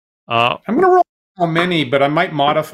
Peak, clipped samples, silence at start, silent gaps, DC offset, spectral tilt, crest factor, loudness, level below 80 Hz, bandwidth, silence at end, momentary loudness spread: 0 dBFS; under 0.1%; 0.3 s; 1.09-1.35 s; under 0.1%; -6.5 dB/octave; 16 dB; -16 LUFS; -58 dBFS; 14 kHz; 0 s; 7 LU